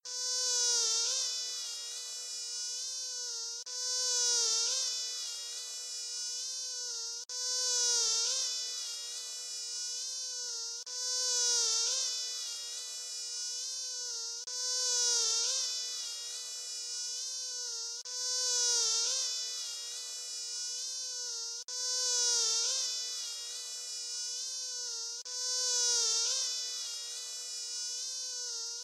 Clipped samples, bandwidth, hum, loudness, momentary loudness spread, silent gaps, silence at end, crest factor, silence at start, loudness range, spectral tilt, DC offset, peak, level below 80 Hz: under 0.1%; 14 kHz; none; -32 LUFS; 11 LU; none; 0 s; 18 dB; 0.05 s; 2 LU; 6.5 dB/octave; under 0.1%; -18 dBFS; under -90 dBFS